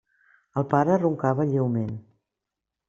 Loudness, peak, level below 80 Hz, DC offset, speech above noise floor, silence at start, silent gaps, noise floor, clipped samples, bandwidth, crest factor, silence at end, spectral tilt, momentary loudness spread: -24 LUFS; -4 dBFS; -62 dBFS; under 0.1%; 63 dB; 0.55 s; none; -86 dBFS; under 0.1%; 7.6 kHz; 22 dB; 0.9 s; -10 dB/octave; 12 LU